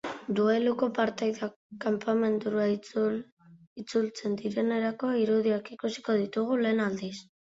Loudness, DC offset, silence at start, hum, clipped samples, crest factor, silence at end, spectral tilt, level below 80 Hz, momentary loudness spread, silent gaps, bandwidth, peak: -29 LUFS; under 0.1%; 0.05 s; none; under 0.1%; 16 dB; 0.25 s; -6 dB/octave; -72 dBFS; 10 LU; 1.56-1.70 s, 3.32-3.37 s, 3.67-3.76 s; 7.8 kHz; -12 dBFS